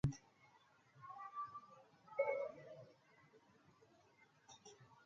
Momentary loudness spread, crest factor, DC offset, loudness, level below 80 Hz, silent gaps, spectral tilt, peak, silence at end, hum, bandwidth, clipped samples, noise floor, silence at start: 28 LU; 24 dB; under 0.1%; -47 LUFS; -70 dBFS; none; -6.5 dB/octave; -26 dBFS; 0 s; none; 7.4 kHz; under 0.1%; -72 dBFS; 0.05 s